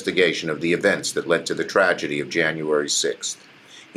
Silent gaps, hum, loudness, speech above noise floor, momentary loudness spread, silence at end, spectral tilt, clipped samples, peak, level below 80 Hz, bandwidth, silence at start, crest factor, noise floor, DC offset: none; none; -21 LUFS; 21 dB; 5 LU; 0.15 s; -3 dB/octave; under 0.1%; -6 dBFS; -68 dBFS; 15 kHz; 0 s; 18 dB; -42 dBFS; under 0.1%